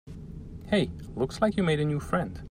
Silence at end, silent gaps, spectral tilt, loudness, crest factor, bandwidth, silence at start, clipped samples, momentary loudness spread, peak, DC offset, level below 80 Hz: 0 s; none; -6.5 dB/octave; -28 LUFS; 18 dB; 14.5 kHz; 0.05 s; under 0.1%; 17 LU; -10 dBFS; under 0.1%; -46 dBFS